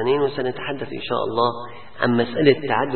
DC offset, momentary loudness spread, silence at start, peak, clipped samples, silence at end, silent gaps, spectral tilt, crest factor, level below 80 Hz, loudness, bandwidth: 1%; 11 LU; 0 s; -2 dBFS; under 0.1%; 0 s; none; -11 dB/octave; 18 dB; -56 dBFS; -21 LUFS; 4.4 kHz